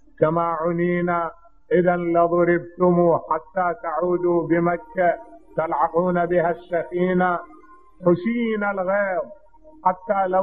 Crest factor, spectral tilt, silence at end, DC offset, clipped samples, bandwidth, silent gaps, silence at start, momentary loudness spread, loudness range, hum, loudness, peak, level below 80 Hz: 18 dB; -11 dB/octave; 0 s; 0.3%; under 0.1%; 3.8 kHz; none; 0.2 s; 6 LU; 3 LU; none; -22 LUFS; -4 dBFS; -56 dBFS